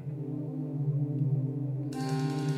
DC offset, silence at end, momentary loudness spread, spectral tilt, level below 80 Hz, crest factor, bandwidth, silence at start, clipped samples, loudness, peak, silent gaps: under 0.1%; 0 s; 6 LU; -8 dB/octave; -70 dBFS; 12 dB; 11.5 kHz; 0 s; under 0.1%; -32 LUFS; -20 dBFS; none